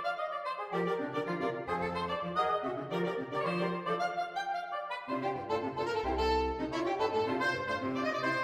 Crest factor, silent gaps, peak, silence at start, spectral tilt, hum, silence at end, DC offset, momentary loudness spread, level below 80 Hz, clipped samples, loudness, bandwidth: 16 dB; none; -18 dBFS; 0 s; -6 dB/octave; none; 0 s; under 0.1%; 5 LU; -52 dBFS; under 0.1%; -34 LUFS; 14 kHz